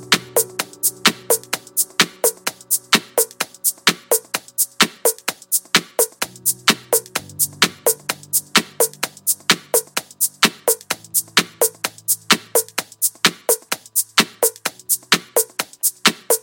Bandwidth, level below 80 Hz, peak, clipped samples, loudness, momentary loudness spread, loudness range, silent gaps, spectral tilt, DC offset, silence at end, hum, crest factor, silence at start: 17 kHz; -64 dBFS; 0 dBFS; under 0.1%; -18 LUFS; 5 LU; 1 LU; none; -0.5 dB/octave; under 0.1%; 0.05 s; none; 20 dB; 0 s